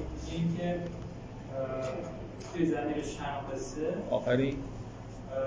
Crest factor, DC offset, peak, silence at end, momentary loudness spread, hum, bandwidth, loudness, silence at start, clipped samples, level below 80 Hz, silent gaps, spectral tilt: 20 dB; under 0.1%; -14 dBFS; 0 s; 13 LU; none; 8 kHz; -35 LUFS; 0 s; under 0.1%; -50 dBFS; none; -6.5 dB/octave